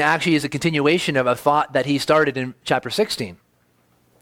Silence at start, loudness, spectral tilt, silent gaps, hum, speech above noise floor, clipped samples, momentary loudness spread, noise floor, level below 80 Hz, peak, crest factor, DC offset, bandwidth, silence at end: 0 s; -20 LUFS; -5 dB/octave; none; none; 42 dB; under 0.1%; 6 LU; -61 dBFS; -58 dBFS; -2 dBFS; 18 dB; under 0.1%; 17 kHz; 0.85 s